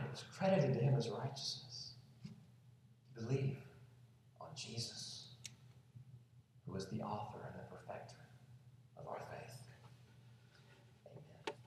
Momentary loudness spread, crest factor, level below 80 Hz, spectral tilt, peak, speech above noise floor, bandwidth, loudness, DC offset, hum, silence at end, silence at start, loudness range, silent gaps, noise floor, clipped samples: 27 LU; 22 dB; -78 dBFS; -5.5 dB/octave; -22 dBFS; 26 dB; 13 kHz; -43 LUFS; under 0.1%; none; 0 s; 0 s; 14 LU; none; -66 dBFS; under 0.1%